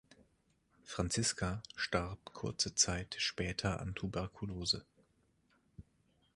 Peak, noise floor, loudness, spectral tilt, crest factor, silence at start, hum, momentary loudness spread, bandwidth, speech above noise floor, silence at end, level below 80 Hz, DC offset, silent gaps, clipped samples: -16 dBFS; -75 dBFS; -37 LUFS; -3 dB/octave; 24 dB; 0.85 s; none; 11 LU; 11.5 kHz; 37 dB; 0.55 s; -54 dBFS; under 0.1%; none; under 0.1%